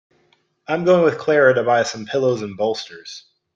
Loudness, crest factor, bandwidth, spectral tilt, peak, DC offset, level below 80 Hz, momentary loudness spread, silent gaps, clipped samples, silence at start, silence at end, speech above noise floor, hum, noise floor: -18 LUFS; 16 dB; 7.8 kHz; -5 dB/octave; -2 dBFS; under 0.1%; -64 dBFS; 19 LU; none; under 0.1%; 0.7 s; 0.35 s; 44 dB; none; -62 dBFS